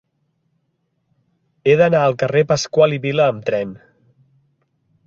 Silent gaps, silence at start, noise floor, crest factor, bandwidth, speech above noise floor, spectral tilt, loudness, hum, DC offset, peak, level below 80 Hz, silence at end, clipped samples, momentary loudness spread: none; 1.65 s; -69 dBFS; 18 dB; 7.8 kHz; 53 dB; -5.5 dB/octave; -16 LUFS; none; under 0.1%; -2 dBFS; -58 dBFS; 1.3 s; under 0.1%; 9 LU